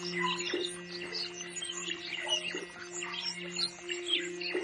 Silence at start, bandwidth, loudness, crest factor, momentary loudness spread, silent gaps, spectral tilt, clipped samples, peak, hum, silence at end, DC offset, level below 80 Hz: 0 s; 11 kHz; -34 LUFS; 18 dB; 6 LU; none; -1.5 dB/octave; under 0.1%; -18 dBFS; none; 0 s; under 0.1%; -76 dBFS